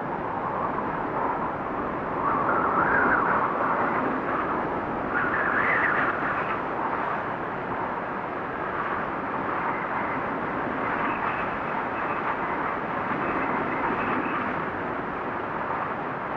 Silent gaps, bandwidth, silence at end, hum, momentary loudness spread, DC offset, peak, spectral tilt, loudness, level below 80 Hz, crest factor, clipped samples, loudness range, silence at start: none; 7.6 kHz; 0 s; none; 8 LU; under 0.1%; -10 dBFS; -8 dB/octave; -27 LUFS; -52 dBFS; 16 dB; under 0.1%; 5 LU; 0 s